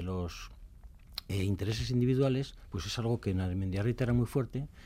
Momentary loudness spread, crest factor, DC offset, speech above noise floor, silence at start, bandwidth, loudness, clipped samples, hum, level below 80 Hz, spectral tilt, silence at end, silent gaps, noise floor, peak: 12 LU; 16 dB; under 0.1%; 20 dB; 0 s; 15.5 kHz; -33 LUFS; under 0.1%; none; -50 dBFS; -7 dB/octave; 0 s; none; -52 dBFS; -18 dBFS